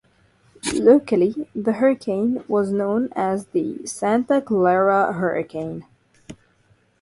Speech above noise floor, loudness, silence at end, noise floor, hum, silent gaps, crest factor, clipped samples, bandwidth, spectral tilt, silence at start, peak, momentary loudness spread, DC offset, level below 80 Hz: 40 dB; -20 LUFS; 0.65 s; -60 dBFS; none; none; 18 dB; under 0.1%; 11.5 kHz; -6 dB/octave; 0.65 s; -2 dBFS; 11 LU; under 0.1%; -60 dBFS